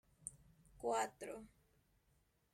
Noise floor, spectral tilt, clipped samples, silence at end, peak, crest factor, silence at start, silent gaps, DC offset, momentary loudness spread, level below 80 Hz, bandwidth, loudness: -78 dBFS; -3 dB/octave; under 0.1%; 1.05 s; -26 dBFS; 22 dB; 0.2 s; none; under 0.1%; 15 LU; -74 dBFS; 16.5 kHz; -45 LUFS